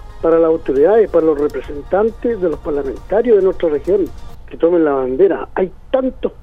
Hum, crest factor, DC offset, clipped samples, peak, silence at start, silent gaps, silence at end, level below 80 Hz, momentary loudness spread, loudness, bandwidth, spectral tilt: none; 14 dB; under 0.1%; under 0.1%; -2 dBFS; 0 s; none; 0.1 s; -36 dBFS; 9 LU; -15 LUFS; 6.2 kHz; -8.5 dB/octave